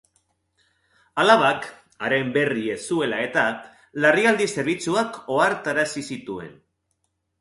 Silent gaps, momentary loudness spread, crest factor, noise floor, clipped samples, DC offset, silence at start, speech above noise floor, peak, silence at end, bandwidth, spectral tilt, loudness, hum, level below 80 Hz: none; 16 LU; 22 dB; -74 dBFS; under 0.1%; under 0.1%; 1.15 s; 52 dB; -2 dBFS; 0.9 s; 11.5 kHz; -4 dB/octave; -22 LUFS; none; -64 dBFS